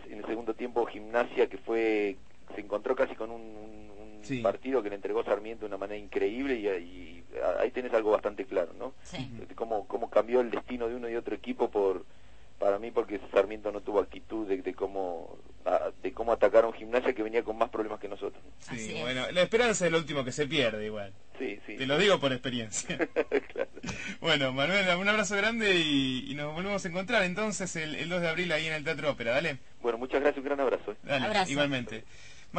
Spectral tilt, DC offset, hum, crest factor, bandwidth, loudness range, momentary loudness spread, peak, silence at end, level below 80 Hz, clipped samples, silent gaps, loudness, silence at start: -4 dB/octave; 0.5%; none; 22 dB; 8.8 kHz; 5 LU; 14 LU; -10 dBFS; 0 s; -58 dBFS; under 0.1%; none; -30 LUFS; 0 s